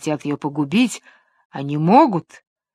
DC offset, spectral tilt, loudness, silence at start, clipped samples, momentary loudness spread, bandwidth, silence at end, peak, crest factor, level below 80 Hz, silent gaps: under 0.1%; -6 dB/octave; -18 LUFS; 0 s; under 0.1%; 17 LU; 13.5 kHz; 0.55 s; 0 dBFS; 20 dB; -68 dBFS; 1.45-1.50 s